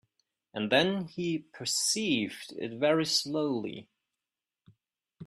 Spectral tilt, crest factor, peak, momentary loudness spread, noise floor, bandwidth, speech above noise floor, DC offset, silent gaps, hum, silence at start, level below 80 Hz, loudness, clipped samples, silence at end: -3 dB/octave; 22 dB; -10 dBFS; 13 LU; under -90 dBFS; 14.5 kHz; over 60 dB; under 0.1%; none; none; 0.55 s; -74 dBFS; -29 LUFS; under 0.1%; 0 s